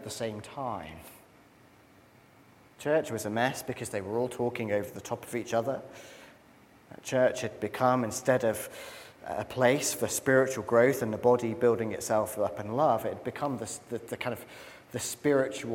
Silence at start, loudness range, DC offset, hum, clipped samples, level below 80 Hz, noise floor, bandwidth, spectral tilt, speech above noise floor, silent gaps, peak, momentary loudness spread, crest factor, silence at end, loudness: 0 s; 7 LU; under 0.1%; none; under 0.1%; -68 dBFS; -58 dBFS; 17 kHz; -4.5 dB/octave; 29 dB; none; -8 dBFS; 15 LU; 22 dB; 0 s; -30 LUFS